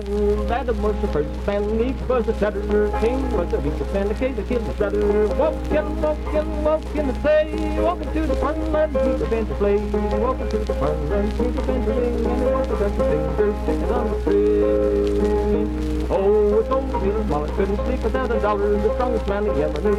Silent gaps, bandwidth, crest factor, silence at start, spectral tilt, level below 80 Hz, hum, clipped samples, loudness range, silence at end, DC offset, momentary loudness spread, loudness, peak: none; 11 kHz; 12 dB; 0 s; -8 dB/octave; -26 dBFS; none; under 0.1%; 2 LU; 0 s; under 0.1%; 5 LU; -21 LUFS; -8 dBFS